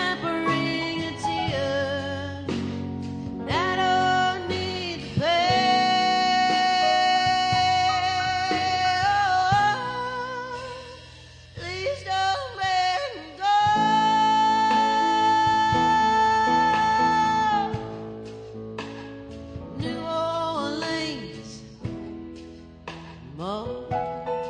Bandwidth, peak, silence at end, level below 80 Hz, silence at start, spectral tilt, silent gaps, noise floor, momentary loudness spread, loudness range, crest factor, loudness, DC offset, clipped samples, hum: 10 kHz; -8 dBFS; 0 s; -52 dBFS; 0 s; -4 dB/octave; none; -46 dBFS; 18 LU; 10 LU; 16 dB; -23 LUFS; under 0.1%; under 0.1%; none